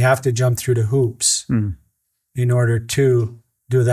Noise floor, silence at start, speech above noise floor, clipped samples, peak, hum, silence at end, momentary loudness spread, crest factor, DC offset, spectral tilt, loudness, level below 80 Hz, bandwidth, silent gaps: -69 dBFS; 0 s; 52 dB; under 0.1%; -2 dBFS; none; 0 s; 10 LU; 16 dB; under 0.1%; -5 dB/octave; -18 LUFS; -46 dBFS; 15 kHz; none